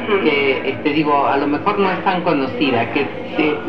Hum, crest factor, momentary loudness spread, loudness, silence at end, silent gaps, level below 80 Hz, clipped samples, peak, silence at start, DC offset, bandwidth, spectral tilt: none; 16 dB; 4 LU; -17 LUFS; 0 s; none; -56 dBFS; under 0.1%; -2 dBFS; 0 s; 2%; 18 kHz; -7.5 dB/octave